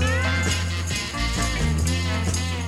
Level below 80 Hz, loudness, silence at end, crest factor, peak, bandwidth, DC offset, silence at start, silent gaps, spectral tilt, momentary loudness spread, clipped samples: -30 dBFS; -24 LUFS; 0 s; 14 dB; -8 dBFS; 14.5 kHz; under 0.1%; 0 s; none; -4 dB/octave; 3 LU; under 0.1%